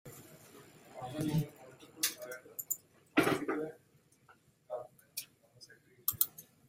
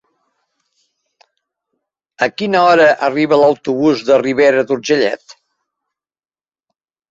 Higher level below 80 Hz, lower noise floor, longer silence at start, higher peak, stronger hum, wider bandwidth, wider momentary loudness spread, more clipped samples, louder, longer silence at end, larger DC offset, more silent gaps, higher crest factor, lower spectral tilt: second, -70 dBFS vs -60 dBFS; second, -68 dBFS vs under -90 dBFS; second, 0.05 s vs 2.2 s; second, -12 dBFS vs -2 dBFS; neither; first, 16.5 kHz vs 7.8 kHz; first, 24 LU vs 9 LU; neither; second, -37 LUFS vs -13 LUFS; second, 0.25 s vs 1.8 s; neither; neither; first, 28 dB vs 14 dB; about the same, -4 dB/octave vs -5 dB/octave